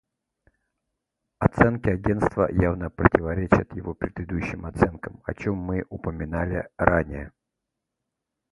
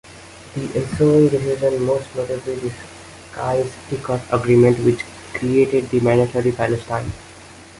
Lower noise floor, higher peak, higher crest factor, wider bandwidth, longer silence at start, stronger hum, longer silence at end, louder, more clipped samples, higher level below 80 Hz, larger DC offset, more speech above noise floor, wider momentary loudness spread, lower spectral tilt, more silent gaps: first, -83 dBFS vs -41 dBFS; first, 0 dBFS vs -4 dBFS; first, 26 dB vs 16 dB; about the same, 11.5 kHz vs 11.5 kHz; first, 1.4 s vs 0.1 s; neither; first, 1.25 s vs 0.15 s; second, -25 LUFS vs -19 LUFS; neither; first, -40 dBFS vs -46 dBFS; neither; first, 59 dB vs 23 dB; second, 12 LU vs 18 LU; first, -9 dB/octave vs -7 dB/octave; neither